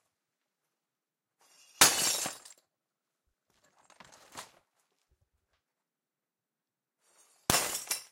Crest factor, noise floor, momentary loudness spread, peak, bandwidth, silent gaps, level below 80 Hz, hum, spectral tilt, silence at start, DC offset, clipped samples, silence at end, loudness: 30 dB; under -90 dBFS; 26 LU; -6 dBFS; 16 kHz; none; -66 dBFS; none; -0.5 dB/octave; 1.8 s; under 0.1%; under 0.1%; 0.1 s; -27 LUFS